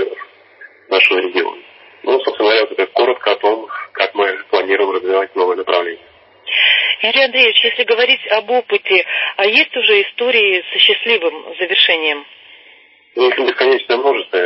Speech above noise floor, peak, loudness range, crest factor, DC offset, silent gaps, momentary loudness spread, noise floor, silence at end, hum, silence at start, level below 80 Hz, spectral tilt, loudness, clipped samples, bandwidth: 32 dB; 0 dBFS; 4 LU; 16 dB; under 0.1%; none; 10 LU; -46 dBFS; 0 s; none; 0 s; -70 dBFS; -3.5 dB/octave; -13 LUFS; under 0.1%; 8 kHz